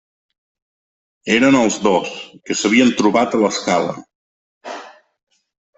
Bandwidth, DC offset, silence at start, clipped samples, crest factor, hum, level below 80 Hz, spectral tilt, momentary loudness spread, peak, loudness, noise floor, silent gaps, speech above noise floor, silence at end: 8.4 kHz; under 0.1%; 1.25 s; under 0.1%; 16 dB; none; -58 dBFS; -4 dB/octave; 19 LU; -2 dBFS; -16 LUFS; -36 dBFS; 4.15-4.61 s; 21 dB; 0.9 s